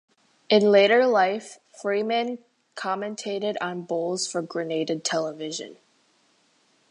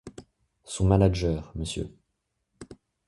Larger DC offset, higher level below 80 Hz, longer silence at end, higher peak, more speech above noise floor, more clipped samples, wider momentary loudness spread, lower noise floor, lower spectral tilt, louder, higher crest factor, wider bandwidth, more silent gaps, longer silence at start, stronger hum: neither; second, -80 dBFS vs -40 dBFS; first, 1.15 s vs 0.35 s; about the same, -6 dBFS vs -6 dBFS; second, 41 dB vs 54 dB; neither; second, 16 LU vs 26 LU; second, -64 dBFS vs -79 dBFS; second, -3.5 dB/octave vs -6.5 dB/octave; about the same, -24 LUFS vs -26 LUFS; about the same, 20 dB vs 22 dB; about the same, 11 kHz vs 11.5 kHz; neither; first, 0.5 s vs 0.05 s; neither